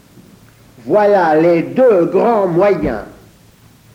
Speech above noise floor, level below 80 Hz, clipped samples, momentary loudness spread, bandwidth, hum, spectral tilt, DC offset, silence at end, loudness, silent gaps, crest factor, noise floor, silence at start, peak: 34 dB; -44 dBFS; under 0.1%; 9 LU; 15.5 kHz; none; -8 dB/octave; under 0.1%; 0.85 s; -12 LUFS; none; 12 dB; -46 dBFS; 0.85 s; -2 dBFS